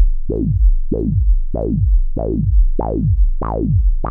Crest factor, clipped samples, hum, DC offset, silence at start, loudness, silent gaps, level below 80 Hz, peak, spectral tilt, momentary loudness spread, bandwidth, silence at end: 10 dB; under 0.1%; none; under 0.1%; 0 s; -18 LUFS; none; -16 dBFS; -4 dBFS; -14 dB/octave; 4 LU; 1.7 kHz; 0 s